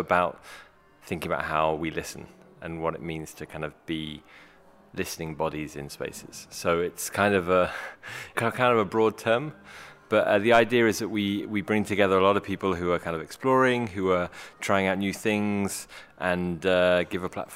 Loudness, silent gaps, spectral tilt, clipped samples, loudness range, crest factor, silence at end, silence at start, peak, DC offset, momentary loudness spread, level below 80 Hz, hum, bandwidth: -26 LUFS; none; -5 dB/octave; under 0.1%; 11 LU; 22 dB; 0 s; 0 s; -6 dBFS; under 0.1%; 17 LU; -56 dBFS; none; 16 kHz